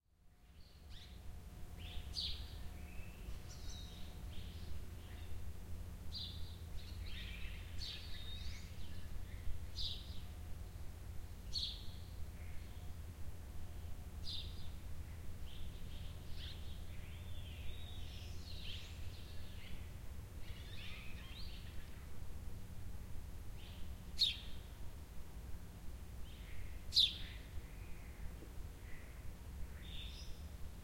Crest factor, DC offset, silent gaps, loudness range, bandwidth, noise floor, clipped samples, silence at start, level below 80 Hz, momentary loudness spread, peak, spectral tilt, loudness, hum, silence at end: 24 dB; under 0.1%; none; 11 LU; 16.5 kHz; -66 dBFS; under 0.1%; 0.25 s; -52 dBFS; 10 LU; -20 dBFS; -3.5 dB/octave; -47 LUFS; none; 0 s